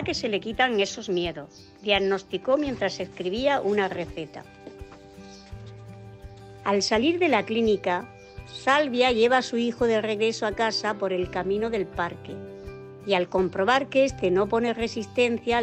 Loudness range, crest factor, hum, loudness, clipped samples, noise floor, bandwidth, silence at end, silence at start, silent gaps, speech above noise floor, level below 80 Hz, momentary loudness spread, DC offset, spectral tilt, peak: 6 LU; 16 dB; none; -25 LUFS; under 0.1%; -46 dBFS; 8.8 kHz; 0 s; 0 s; none; 21 dB; -52 dBFS; 22 LU; under 0.1%; -4.5 dB/octave; -8 dBFS